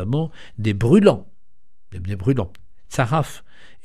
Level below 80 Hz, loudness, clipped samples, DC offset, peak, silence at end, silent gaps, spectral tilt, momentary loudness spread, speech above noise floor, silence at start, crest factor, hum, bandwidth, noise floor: -44 dBFS; -20 LUFS; under 0.1%; 2%; 0 dBFS; 0.45 s; none; -7.5 dB/octave; 17 LU; 45 dB; 0 s; 20 dB; none; 14 kHz; -65 dBFS